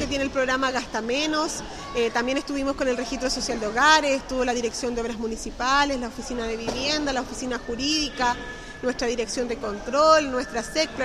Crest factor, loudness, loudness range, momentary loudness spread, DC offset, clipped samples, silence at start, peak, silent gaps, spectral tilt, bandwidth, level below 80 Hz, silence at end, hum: 22 dB; -24 LUFS; 3 LU; 11 LU; under 0.1%; under 0.1%; 0 s; -4 dBFS; none; -2.5 dB/octave; 14.5 kHz; -44 dBFS; 0 s; none